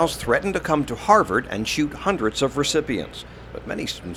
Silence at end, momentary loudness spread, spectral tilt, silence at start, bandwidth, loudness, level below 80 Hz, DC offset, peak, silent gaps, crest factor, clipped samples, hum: 0 s; 15 LU; -4 dB/octave; 0 s; 16.5 kHz; -22 LUFS; -44 dBFS; under 0.1%; -2 dBFS; none; 22 dB; under 0.1%; none